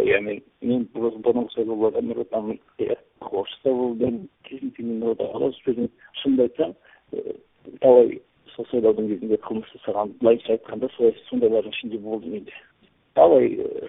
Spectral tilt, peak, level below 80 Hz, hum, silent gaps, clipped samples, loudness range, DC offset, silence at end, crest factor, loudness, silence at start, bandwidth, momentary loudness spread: -10.5 dB/octave; -2 dBFS; -62 dBFS; none; none; under 0.1%; 5 LU; under 0.1%; 0 s; 20 dB; -23 LUFS; 0 s; 3.9 kHz; 17 LU